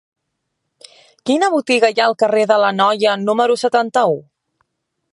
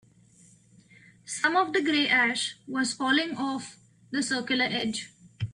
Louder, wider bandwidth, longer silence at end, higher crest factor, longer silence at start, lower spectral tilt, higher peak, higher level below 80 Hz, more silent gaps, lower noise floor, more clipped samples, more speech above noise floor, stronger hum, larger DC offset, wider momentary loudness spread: first, -15 LUFS vs -26 LUFS; about the same, 11.5 kHz vs 11.5 kHz; first, 0.95 s vs 0 s; about the same, 16 dB vs 18 dB; about the same, 1.25 s vs 1.25 s; about the same, -4 dB/octave vs -3 dB/octave; first, -2 dBFS vs -12 dBFS; second, -74 dBFS vs -68 dBFS; neither; first, -74 dBFS vs -58 dBFS; neither; first, 59 dB vs 31 dB; neither; neither; second, 5 LU vs 14 LU